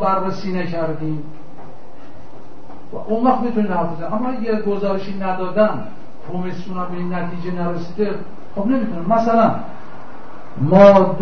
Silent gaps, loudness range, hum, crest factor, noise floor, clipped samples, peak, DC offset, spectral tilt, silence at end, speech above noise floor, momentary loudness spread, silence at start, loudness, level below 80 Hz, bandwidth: none; 5 LU; none; 20 dB; -41 dBFS; under 0.1%; 0 dBFS; 7%; -8.5 dB/octave; 0 s; 24 dB; 20 LU; 0 s; -18 LUFS; -52 dBFS; 6.6 kHz